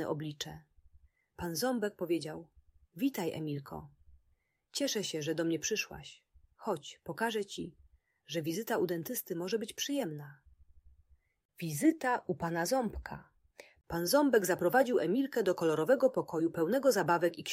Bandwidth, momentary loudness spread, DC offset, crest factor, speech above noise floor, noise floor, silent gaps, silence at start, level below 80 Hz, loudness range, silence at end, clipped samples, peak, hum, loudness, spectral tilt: 16 kHz; 15 LU; under 0.1%; 20 dB; 43 dB; -76 dBFS; 11.45-11.49 s; 0 s; -62 dBFS; 8 LU; 0 s; under 0.1%; -14 dBFS; none; -33 LUFS; -4.5 dB/octave